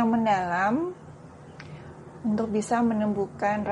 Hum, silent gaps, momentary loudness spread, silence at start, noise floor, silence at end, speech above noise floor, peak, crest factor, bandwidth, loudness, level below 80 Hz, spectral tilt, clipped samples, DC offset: none; none; 21 LU; 0 s; -46 dBFS; 0 s; 20 dB; -12 dBFS; 14 dB; 11 kHz; -26 LUFS; -60 dBFS; -6.5 dB/octave; under 0.1%; under 0.1%